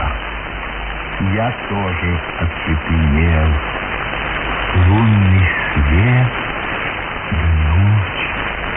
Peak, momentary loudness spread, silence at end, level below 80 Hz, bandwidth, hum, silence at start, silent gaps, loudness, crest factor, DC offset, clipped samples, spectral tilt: -2 dBFS; 9 LU; 0 s; -24 dBFS; 3.7 kHz; none; 0 s; none; -17 LUFS; 14 dB; under 0.1%; under 0.1%; -11.5 dB/octave